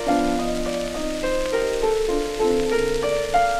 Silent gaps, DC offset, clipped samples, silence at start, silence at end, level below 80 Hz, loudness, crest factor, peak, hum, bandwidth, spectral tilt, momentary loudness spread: none; 0.2%; under 0.1%; 0 s; 0 s; -34 dBFS; -23 LUFS; 12 dB; -8 dBFS; none; 15.5 kHz; -4 dB/octave; 5 LU